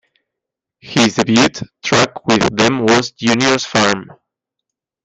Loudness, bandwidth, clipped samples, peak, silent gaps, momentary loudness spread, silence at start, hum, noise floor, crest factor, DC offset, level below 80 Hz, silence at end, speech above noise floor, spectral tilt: -14 LUFS; 9.6 kHz; under 0.1%; 0 dBFS; none; 4 LU; 0.85 s; none; -82 dBFS; 16 dB; under 0.1%; -50 dBFS; 1 s; 68 dB; -4 dB/octave